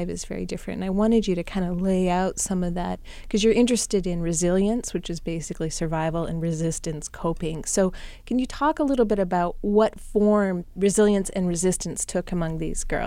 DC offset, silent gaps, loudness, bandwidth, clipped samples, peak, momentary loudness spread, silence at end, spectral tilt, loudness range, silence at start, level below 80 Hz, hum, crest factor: under 0.1%; none; -24 LUFS; 16 kHz; under 0.1%; -8 dBFS; 10 LU; 0 s; -5 dB/octave; 5 LU; 0 s; -38 dBFS; none; 16 dB